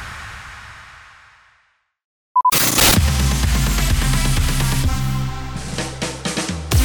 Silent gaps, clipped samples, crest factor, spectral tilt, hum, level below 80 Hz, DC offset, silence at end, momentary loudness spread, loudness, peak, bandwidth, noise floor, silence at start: 2.04-2.35 s; under 0.1%; 18 dB; -3.5 dB/octave; none; -24 dBFS; under 0.1%; 0 s; 21 LU; -18 LUFS; -2 dBFS; over 20 kHz; -62 dBFS; 0 s